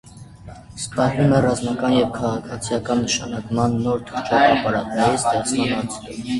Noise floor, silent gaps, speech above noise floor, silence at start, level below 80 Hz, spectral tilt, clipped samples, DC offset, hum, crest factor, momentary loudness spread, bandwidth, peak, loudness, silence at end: -40 dBFS; none; 20 dB; 0.05 s; -46 dBFS; -5 dB/octave; under 0.1%; under 0.1%; none; 18 dB; 11 LU; 11.5 kHz; -2 dBFS; -20 LUFS; 0 s